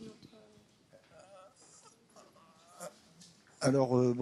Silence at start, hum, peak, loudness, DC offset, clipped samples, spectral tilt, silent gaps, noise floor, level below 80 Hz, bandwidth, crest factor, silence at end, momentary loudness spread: 0 s; none; -16 dBFS; -30 LUFS; under 0.1%; under 0.1%; -6.5 dB/octave; none; -64 dBFS; -78 dBFS; 12.5 kHz; 20 dB; 0 s; 29 LU